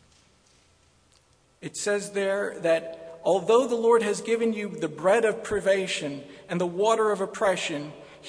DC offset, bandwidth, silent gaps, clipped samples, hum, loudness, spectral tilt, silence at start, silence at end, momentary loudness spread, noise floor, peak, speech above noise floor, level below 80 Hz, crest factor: under 0.1%; 11 kHz; none; under 0.1%; none; -25 LUFS; -4 dB/octave; 1.65 s; 0 s; 13 LU; -62 dBFS; -8 dBFS; 37 dB; -64 dBFS; 18 dB